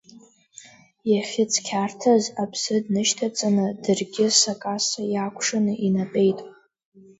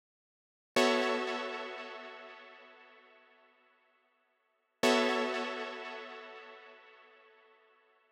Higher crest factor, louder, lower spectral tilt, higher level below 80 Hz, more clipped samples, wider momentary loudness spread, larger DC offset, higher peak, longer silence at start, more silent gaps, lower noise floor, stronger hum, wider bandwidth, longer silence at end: second, 20 dB vs 26 dB; first, -22 LUFS vs -33 LUFS; first, -3.5 dB/octave vs -2 dB/octave; first, -68 dBFS vs under -90 dBFS; neither; second, 7 LU vs 24 LU; neither; first, -4 dBFS vs -12 dBFS; second, 0.15 s vs 0.75 s; neither; second, -51 dBFS vs -78 dBFS; neither; second, 8 kHz vs 19.5 kHz; second, 0.7 s vs 1.2 s